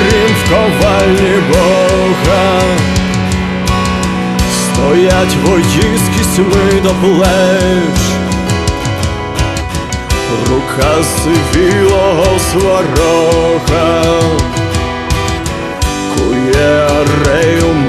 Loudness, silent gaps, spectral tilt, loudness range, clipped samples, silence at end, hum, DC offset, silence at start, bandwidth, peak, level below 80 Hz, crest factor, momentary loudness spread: -11 LUFS; none; -5 dB/octave; 3 LU; under 0.1%; 0 s; none; under 0.1%; 0 s; 13.5 kHz; 0 dBFS; -22 dBFS; 10 dB; 6 LU